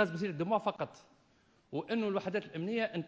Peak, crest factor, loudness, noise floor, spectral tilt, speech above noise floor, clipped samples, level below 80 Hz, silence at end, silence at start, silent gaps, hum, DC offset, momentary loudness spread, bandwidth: -16 dBFS; 18 dB; -36 LUFS; -69 dBFS; -7 dB/octave; 34 dB; under 0.1%; -78 dBFS; 0 s; 0 s; none; none; under 0.1%; 9 LU; 8 kHz